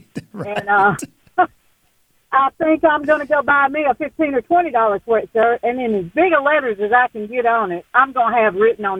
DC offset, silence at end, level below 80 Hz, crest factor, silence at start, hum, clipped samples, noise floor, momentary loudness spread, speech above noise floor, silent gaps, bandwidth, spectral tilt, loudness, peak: under 0.1%; 0 s; -54 dBFS; 16 dB; 0.15 s; none; under 0.1%; -60 dBFS; 5 LU; 43 dB; none; 14.5 kHz; -5.5 dB/octave; -17 LUFS; -2 dBFS